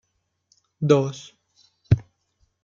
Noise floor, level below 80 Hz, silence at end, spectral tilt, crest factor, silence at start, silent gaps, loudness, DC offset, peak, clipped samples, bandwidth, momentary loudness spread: -71 dBFS; -46 dBFS; 0.65 s; -7.5 dB/octave; 22 dB; 0.8 s; none; -23 LUFS; under 0.1%; -4 dBFS; under 0.1%; 7.4 kHz; 11 LU